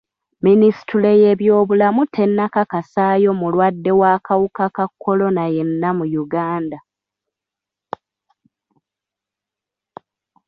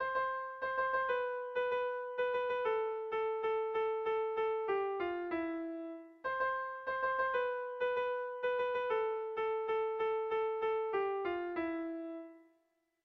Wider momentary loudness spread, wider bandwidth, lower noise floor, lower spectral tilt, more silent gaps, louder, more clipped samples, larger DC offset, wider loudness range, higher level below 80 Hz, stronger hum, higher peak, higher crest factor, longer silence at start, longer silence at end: first, 10 LU vs 5 LU; about the same, 5.6 kHz vs 6 kHz; first, -86 dBFS vs -78 dBFS; first, -10 dB/octave vs -6 dB/octave; neither; first, -16 LUFS vs -36 LUFS; neither; neither; first, 12 LU vs 1 LU; first, -60 dBFS vs -74 dBFS; neither; first, -4 dBFS vs -24 dBFS; about the same, 14 dB vs 14 dB; first, 0.45 s vs 0 s; first, 3.7 s vs 0.65 s